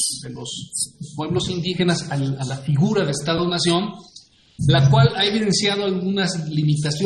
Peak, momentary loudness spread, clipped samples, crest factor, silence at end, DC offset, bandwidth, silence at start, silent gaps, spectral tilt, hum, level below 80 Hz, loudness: -4 dBFS; 12 LU; under 0.1%; 18 dB; 0 s; under 0.1%; 12 kHz; 0 s; none; -5 dB/octave; none; -48 dBFS; -20 LUFS